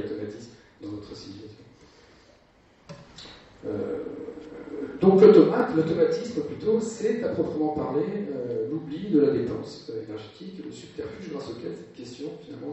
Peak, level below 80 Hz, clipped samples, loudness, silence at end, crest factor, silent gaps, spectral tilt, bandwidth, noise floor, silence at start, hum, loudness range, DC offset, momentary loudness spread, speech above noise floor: -4 dBFS; -60 dBFS; under 0.1%; -24 LUFS; 0 s; 22 dB; none; -7.5 dB/octave; 8.4 kHz; -58 dBFS; 0 s; none; 18 LU; under 0.1%; 20 LU; 33 dB